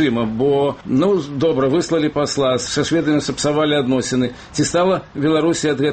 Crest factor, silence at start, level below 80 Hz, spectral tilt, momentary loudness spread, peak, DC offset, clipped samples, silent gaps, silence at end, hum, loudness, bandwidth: 12 dB; 0 s; -48 dBFS; -5 dB/octave; 3 LU; -6 dBFS; under 0.1%; under 0.1%; none; 0 s; none; -18 LUFS; 8.8 kHz